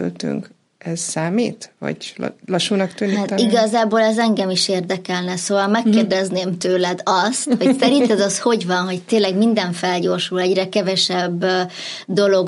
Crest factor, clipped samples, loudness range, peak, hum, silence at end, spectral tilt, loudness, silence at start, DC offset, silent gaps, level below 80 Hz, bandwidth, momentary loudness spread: 16 dB; under 0.1%; 3 LU; -2 dBFS; none; 0 s; -4.5 dB/octave; -18 LUFS; 0 s; under 0.1%; none; -72 dBFS; 11.5 kHz; 10 LU